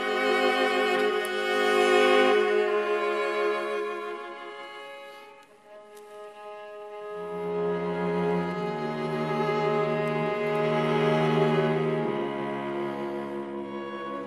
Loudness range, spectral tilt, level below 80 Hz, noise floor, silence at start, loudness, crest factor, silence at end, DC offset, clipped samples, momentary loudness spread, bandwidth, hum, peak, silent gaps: 13 LU; -5.5 dB/octave; -66 dBFS; -51 dBFS; 0 s; -26 LUFS; 18 dB; 0 s; under 0.1%; under 0.1%; 19 LU; 13.5 kHz; none; -10 dBFS; none